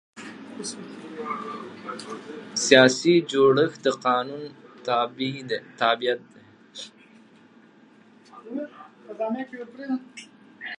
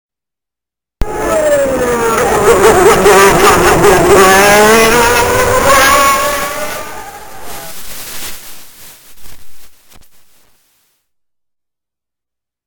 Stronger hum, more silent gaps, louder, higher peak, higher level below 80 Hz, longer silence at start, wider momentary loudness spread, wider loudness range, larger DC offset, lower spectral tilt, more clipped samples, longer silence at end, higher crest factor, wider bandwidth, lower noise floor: neither; neither; second, -23 LUFS vs -8 LUFS; about the same, 0 dBFS vs 0 dBFS; second, -78 dBFS vs -30 dBFS; second, 0.15 s vs 1 s; about the same, 22 LU vs 20 LU; second, 16 LU vs 22 LU; neither; about the same, -3.5 dB/octave vs -3 dB/octave; second, under 0.1% vs 0.6%; second, 0.05 s vs 2.65 s; first, 26 dB vs 12 dB; second, 11 kHz vs over 20 kHz; second, -54 dBFS vs -87 dBFS